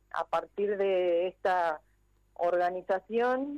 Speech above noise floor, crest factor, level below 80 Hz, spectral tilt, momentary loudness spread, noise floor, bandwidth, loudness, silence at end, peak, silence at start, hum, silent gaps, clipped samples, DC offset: 34 dB; 10 dB; -68 dBFS; -6 dB/octave; 5 LU; -64 dBFS; 9.2 kHz; -30 LUFS; 0 s; -20 dBFS; 0.15 s; 50 Hz at -70 dBFS; none; under 0.1%; under 0.1%